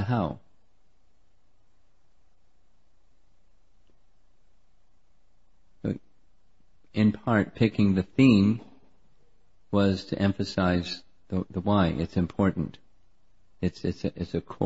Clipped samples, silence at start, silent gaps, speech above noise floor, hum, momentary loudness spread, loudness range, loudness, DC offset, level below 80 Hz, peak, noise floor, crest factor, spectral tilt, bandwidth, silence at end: under 0.1%; 0 s; none; 44 dB; none; 13 LU; 18 LU; -26 LUFS; 0.3%; -52 dBFS; -8 dBFS; -69 dBFS; 22 dB; -8 dB/octave; 8 kHz; 0 s